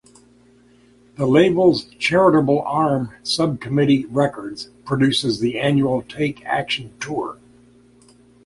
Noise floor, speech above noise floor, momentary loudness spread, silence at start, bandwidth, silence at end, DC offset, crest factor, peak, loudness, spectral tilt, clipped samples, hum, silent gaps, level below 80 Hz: -52 dBFS; 34 dB; 11 LU; 1.2 s; 11.5 kHz; 1.1 s; under 0.1%; 18 dB; -2 dBFS; -19 LUFS; -6 dB/octave; under 0.1%; 60 Hz at -40 dBFS; none; -54 dBFS